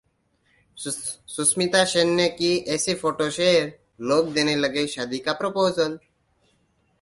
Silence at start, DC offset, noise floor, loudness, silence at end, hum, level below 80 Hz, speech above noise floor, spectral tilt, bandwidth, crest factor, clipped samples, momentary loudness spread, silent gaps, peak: 0.75 s; under 0.1%; -67 dBFS; -22 LUFS; 1.05 s; none; -62 dBFS; 44 dB; -3 dB/octave; 11.5 kHz; 18 dB; under 0.1%; 11 LU; none; -6 dBFS